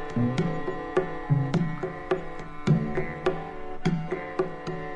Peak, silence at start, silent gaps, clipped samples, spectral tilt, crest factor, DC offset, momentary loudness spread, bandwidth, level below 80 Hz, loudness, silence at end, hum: -10 dBFS; 0 s; none; under 0.1%; -8 dB/octave; 18 dB; under 0.1%; 8 LU; 9.6 kHz; -44 dBFS; -29 LUFS; 0 s; none